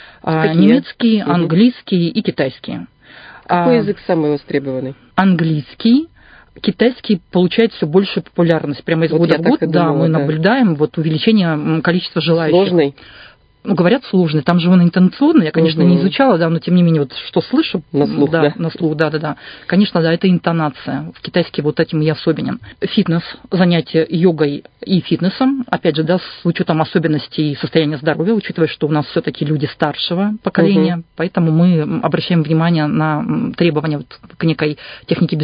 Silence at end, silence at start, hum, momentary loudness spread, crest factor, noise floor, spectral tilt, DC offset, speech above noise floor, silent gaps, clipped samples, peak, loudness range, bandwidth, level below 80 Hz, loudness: 0 s; 0.25 s; none; 8 LU; 14 dB; -39 dBFS; -10 dB/octave; under 0.1%; 25 dB; none; under 0.1%; 0 dBFS; 4 LU; 5.2 kHz; -52 dBFS; -15 LUFS